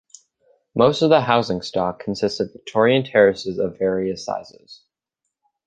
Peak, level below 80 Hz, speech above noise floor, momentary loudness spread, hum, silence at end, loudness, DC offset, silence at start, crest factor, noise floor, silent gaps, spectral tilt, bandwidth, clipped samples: -2 dBFS; -56 dBFS; 61 dB; 12 LU; none; 0.95 s; -20 LUFS; under 0.1%; 0.75 s; 20 dB; -81 dBFS; none; -5.5 dB/octave; 9 kHz; under 0.1%